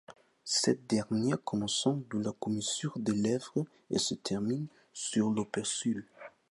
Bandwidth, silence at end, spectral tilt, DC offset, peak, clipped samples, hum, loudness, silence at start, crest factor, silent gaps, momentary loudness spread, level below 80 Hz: 11.5 kHz; 0.2 s; -4 dB/octave; under 0.1%; -14 dBFS; under 0.1%; none; -33 LUFS; 0.1 s; 20 dB; none; 8 LU; -70 dBFS